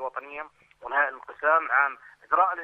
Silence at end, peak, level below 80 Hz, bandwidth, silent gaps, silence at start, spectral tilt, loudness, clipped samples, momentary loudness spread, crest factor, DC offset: 0 s; -8 dBFS; -72 dBFS; 4.7 kHz; none; 0 s; -4 dB/octave; -25 LUFS; under 0.1%; 21 LU; 18 dB; under 0.1%